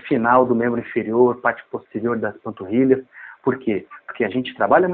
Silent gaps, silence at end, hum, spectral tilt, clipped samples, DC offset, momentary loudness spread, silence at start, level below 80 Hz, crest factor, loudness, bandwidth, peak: none; 0 s; none; -5.5 dB/octave; under 0.1%; under 0.1%; 13 LU; 0.05 s; -60 dBFS; 18 dB; -20 LUFS; 4.1 kHz; -2 dBFS